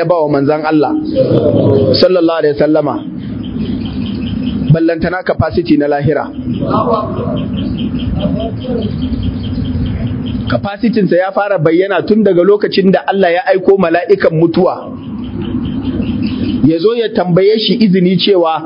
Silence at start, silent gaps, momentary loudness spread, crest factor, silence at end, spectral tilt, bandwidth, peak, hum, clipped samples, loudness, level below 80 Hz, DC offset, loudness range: 0 s; none; 9 LU; 12 dB; 0 s; -10 dB/octave; 5.4 kHz; 0 dBFS; none; 0.2%; -12 LUFS; -30 dBFS; under 0.1%; 6 LU